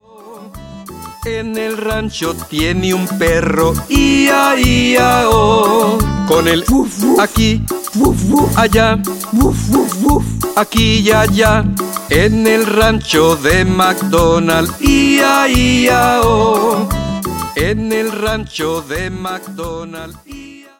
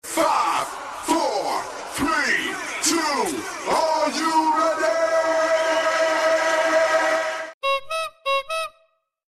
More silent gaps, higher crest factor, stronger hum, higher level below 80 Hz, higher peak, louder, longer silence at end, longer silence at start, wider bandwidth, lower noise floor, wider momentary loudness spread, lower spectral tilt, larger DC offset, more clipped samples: second, none vs 7.54-7.61 s; about the same, 12 dB vs 14 dB; neither; first, -26 dBFS vs -58 dBFS; first, 0 dBFS vs -8 dBFS; first, -12 LUFS vs -21 LUFS; second, 0.2 s vs 0.65 s; first, 0.2 s vs 0.05 s; first, 17 kHz vs 14 kHz; second, -35 dBFS vs -64 dBFS; first, 12 LU vs 9 LU; first, -4.5 dB/octave vs -1.5 dB/octave; neither; neither